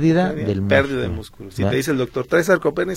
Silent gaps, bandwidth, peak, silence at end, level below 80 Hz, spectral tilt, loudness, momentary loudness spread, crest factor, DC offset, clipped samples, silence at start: none; 16.5 kHz; -2 dBFS; 0 s; -44 dBFS; -6.5 dB/octave; -19 LUFS; 9 LU; 18 dB; under 0.1%; under 0.1%; 0 s